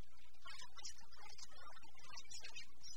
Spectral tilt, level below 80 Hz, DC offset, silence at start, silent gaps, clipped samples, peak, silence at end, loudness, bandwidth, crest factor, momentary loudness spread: -1 dB/octave; -72 dBFS; 1%; 0 s; none; under 0.1%; -34 dBFS; 0 s; -56 LUFS; over 20 kHz; 20 dB; 8 LU